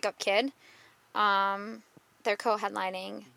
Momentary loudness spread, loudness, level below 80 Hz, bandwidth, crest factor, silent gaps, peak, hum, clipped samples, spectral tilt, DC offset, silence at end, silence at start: 12 LU; -30 LUFS; -86 dBFS; 16 kHz; 20 dB; none; -12 dBFS; none; under 0.1%; -3 dB/octave; under 0.1%; 0.1 s; 0.05 s